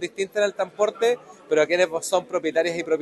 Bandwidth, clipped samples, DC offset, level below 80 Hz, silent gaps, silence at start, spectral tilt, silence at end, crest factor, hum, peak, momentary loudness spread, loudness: 12.5 kHz; under 0.1%; under 0.1%; -72 dBFS; none; 0 s; -3 dB/octave; 0 s; 18 dB; none; -6 dBFS; 4 LU; -23 LUFS